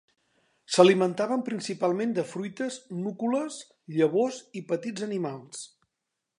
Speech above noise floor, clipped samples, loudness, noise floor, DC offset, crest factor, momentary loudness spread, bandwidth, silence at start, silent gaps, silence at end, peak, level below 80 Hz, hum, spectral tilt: 57 dB; under 0.1%; -27 LUFS; -84 dBFS; under 0.1%; 24 dB; 19 LU; 11 kHz; 0.7 s; none; 0.75 s; -4 dBFS; -80 dBFS; none; -5 dB/octave